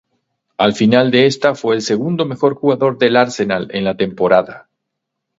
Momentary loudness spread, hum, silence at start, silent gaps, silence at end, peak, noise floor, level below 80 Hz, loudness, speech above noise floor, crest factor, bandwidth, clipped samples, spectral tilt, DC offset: 7 LU; none; 0.6 s; none; 0.8 s; 0 dBFS; -77 dBFS; -56 dBFS; -15 LUFS; 62 dB; 16 dB; 8 kHz; under 0.1%; -5.5 dB/octave; under 0.1%